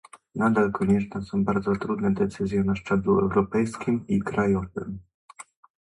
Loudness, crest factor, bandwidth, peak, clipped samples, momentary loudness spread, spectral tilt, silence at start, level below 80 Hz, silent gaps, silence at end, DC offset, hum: -25 LUFS; 16 dB; 11 kHz; -8 dBFS; under 0.1%; 8 LU; -8 dB/octave; 0.15 s; -50 dBFS; 5.14-5.28 s; 0.4 s; under 0.1%; none